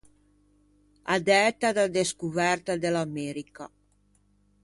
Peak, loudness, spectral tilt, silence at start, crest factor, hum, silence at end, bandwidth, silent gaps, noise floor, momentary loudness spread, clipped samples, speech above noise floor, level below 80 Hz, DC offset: -8 dBFS; -26 LUFS; -4 dB/octave; 1.05 s; 20 dB; 50 Hz at -55 dBFS; 0.95 s; 11.5 kHz; none; -66 dBFS; 20 LU; under 0.1%; 40 dB; -64 dBFS; under 0.1%